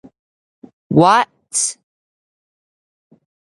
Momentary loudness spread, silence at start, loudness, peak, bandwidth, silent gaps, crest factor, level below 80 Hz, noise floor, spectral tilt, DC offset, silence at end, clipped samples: 9 LU; 0.9 s; -15 LUFS; 0 dBFS; 11.5 kHz; none; 20 dB; -62 dBFS; under -90 dBFS; -4 dB/octave; under 0.1%; 1.85 s; under 0.1%